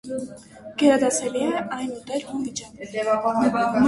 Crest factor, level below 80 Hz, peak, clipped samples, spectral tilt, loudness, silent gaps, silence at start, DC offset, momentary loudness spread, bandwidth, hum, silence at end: 18 dB; -58 dBFS; -4 dBFS; under 0.1%; -4 dB/octave; -23 LUFS; none; 0.05 s; under 0.1%; 14 LU; 11.5 kHz; none; 0 s